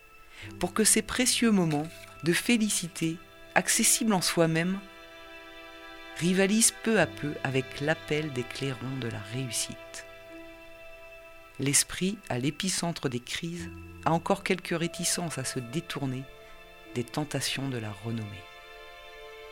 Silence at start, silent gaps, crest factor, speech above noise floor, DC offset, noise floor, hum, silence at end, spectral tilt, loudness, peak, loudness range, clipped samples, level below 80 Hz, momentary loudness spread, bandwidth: 0.15 s; none; 24 dB; 20 dB; under 0.1%; -49 dBFS; none; 0 s; -3.5 dB/octave; -28 LUFS; -6 dBFS; 8 LU; under 0.1%; -56 dBFS; 23 LU; 17 kHz